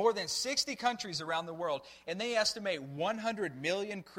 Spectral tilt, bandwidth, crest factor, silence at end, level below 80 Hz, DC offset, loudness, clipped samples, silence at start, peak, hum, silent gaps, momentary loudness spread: -2.5 dB/octave; 16 kHz; 18 dB; 0 s; -72 dBFS; under 0.1%; -34 LUFS; under 0.1%; 0 s; -16 dBFS; none; none; 7 LU